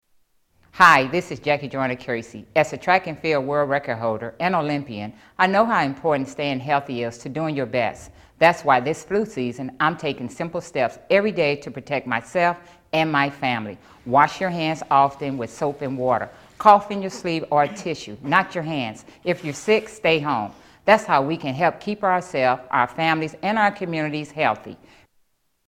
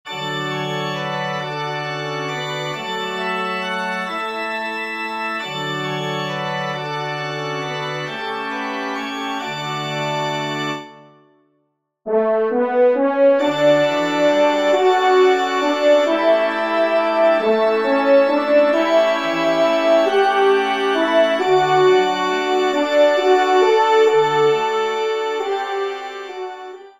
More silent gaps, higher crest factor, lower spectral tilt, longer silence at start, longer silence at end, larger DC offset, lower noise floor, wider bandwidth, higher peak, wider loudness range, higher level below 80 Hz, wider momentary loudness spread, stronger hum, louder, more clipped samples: neither; first, 22 dB vs 14 dB; about the same, -5.5 dB/octave vs -5 dB/octave; first, 0.75 s vs 0.05 s; first, 0.9 s vs 0.1 s; neither; about the same, -65 dBFS vs -68 dBFS; first, 16 kHz vs 14.5 kHz; first, 0 dBFS vs -4 dBFS; second, 3 LU vs 8 LU; first, -58 dBFS vs -68 dBFS; about the same, 11 LU vs 10 LU; neither; second, -21 LUFS vs -18 LUFS; neither